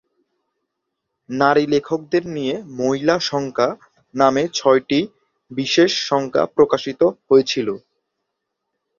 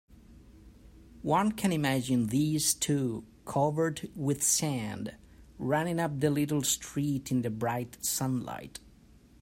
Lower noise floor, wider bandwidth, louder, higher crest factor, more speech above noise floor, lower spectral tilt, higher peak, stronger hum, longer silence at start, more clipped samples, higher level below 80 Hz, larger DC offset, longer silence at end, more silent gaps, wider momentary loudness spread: first, -78 dBFS vs -58 dBFS; second, 7.4 kHz vs 16 kHz; first, -18 LUFS vs -30 LUFS; about the same, 18 dB vs 20 dB; first, 60 dB vs 28 dB; about the same, -4.5 dB/octave vs -4.5 dB/octave; first, -2 dBFS vs -12 dBFS; neither; first, 1.3 s vs 0.1 s; neither; about the same, -60 dBFS vs -58 dBFS; neither; first, 1.2 s vs 0.65 s; neither; about the same, 11 LU vs 12 LU